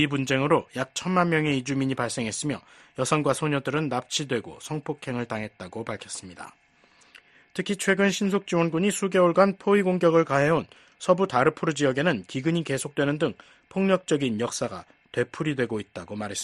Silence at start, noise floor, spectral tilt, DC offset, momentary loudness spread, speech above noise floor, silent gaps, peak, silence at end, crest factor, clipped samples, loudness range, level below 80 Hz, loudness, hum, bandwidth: 0 s; -59 dBFS; -5 dB/octave; under 0.1%; 13 LU; 34 dB; none; -6 dBFS; 0 s; 20 dB; under 0.1%; 9 LU; -62 dBFS; -25 LUFS; none; 12.5 kHz